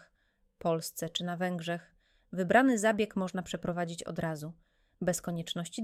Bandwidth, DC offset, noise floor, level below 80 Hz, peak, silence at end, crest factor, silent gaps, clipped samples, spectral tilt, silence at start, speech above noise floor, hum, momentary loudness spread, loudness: 16 kHz; under 0.1%; -73 dBFS; -66 dBFS; -10 dBFS; 0 s; 22 dB; none; under 0.1%; -5 dB/octave; 0.65 s; 41 dB; none; 12 LU; -32 LUFS